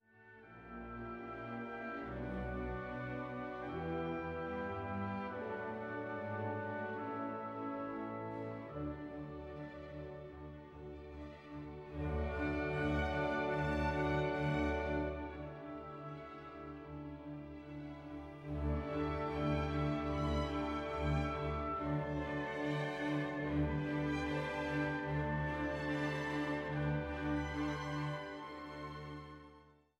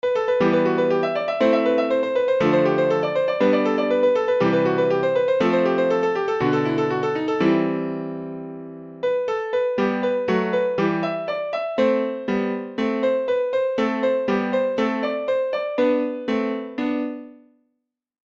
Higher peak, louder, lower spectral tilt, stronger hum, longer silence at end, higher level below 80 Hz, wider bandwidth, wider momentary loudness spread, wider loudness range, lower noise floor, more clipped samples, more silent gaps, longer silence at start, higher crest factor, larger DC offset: second, -24 dBFS vs -6 dBFS; second, -40 LUFS vs -21 LUFS; about the same, -7.5 dB/octave vs -7 dB/octave; neither; second, 0.25 s vs 1.1 s; first, -50 dBFS vs -62 dBFS; first, 9.4 kHz vs 7.4 kHz; first, 13 LU vs 7 LU; first, 8 LU vs 4 LU; second, -63 dBFS vs -78 dBFS; neither; neither; about the same, 0.15 s vs 0.05 s; about the same, 16 dB vs 16 dB; neither